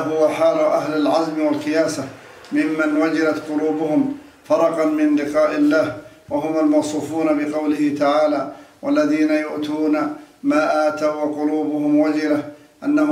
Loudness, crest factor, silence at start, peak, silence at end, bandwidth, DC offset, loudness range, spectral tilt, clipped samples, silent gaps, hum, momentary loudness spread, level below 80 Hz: -19 LUFS; 14 dB; 0 s; -4 dBFS; 0 s; 12 kHz; under 0.1%; 1 LU; -5.5 dB/octave; under 0.1%; none; none; 8 LU; -64 dBFS